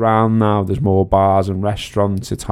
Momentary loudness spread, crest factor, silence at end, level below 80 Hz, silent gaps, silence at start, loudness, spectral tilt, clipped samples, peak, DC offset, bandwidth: 6 LU; 16 dB; 0 s; -36 dBFS; none; 0 s; -16 LUFS; -7.5 dB/octave; under 0.1%; 0 dBFS; under 0.1%; 13 kHz